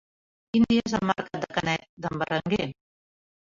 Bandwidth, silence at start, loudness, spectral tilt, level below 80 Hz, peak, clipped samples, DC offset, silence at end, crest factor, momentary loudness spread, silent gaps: 7.6 kHz; 0.55 s; -27 LUFS; -5.5 dB/octave; -54 dBFS; -8 dBFS; under 0.1%; under 0.1%; 0.8 s; 20 dB; 8 LU; 1.89-1.97 s